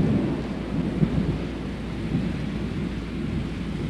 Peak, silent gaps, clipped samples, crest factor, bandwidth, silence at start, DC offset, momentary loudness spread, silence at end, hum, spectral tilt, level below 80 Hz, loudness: -8 dBFS; none; under 0.1%; 18 dB; 11 kHz; 0 s; under 0.1%; 7 LU; 0 s; none; -8 dB/octave; -36 dBFS; -28 LUFS